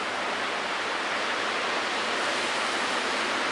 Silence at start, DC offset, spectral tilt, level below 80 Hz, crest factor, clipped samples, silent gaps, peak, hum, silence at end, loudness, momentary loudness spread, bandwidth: 0 s; under 0.1%; -1 dB/octave; -70 dBFS; 12 dB; under 0.1%; none; -16 dBFS; none; 0 s; -27 LUFS; 2 LU; 11.5 kHz